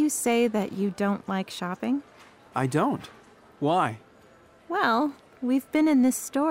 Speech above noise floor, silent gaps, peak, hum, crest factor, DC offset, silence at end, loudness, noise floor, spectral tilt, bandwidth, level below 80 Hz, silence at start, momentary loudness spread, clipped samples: 30 dB; none; -10 dBFS; none; 16 dB; under 0.1%; 0 s; -26 LUFS; -55 dBFS; -5 dB/octave; 16 kHz; -68 dBFS; 0 s; 10 LU; under 0.1%